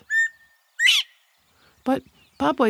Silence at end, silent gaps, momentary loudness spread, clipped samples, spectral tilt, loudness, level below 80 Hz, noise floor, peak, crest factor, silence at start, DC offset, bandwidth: 0 s; none; 13 LU; under 0.1%; -1.5 dB/octave; -21 LUFS; -62 dBFS; -61 dBFS; -6 dBFS; 18 dB; 0.1 s; under 0.1%; 16.5 kHz